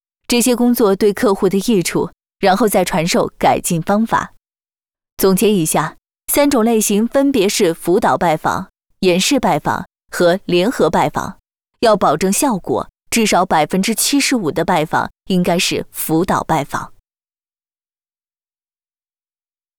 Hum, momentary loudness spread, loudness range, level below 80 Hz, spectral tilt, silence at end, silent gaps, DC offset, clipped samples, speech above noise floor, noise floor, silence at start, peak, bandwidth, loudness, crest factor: none; 8 LU; 5 LU; -46 dBFS; -4 dB/octave; 2.9 s; 5.12-5.17 s; under 0.1%; under 0.1%; over 75 dB; under -90 dBFS; 0.3 s; -4 dBFS; over 20 kHz; -15 LUFS; 12 dB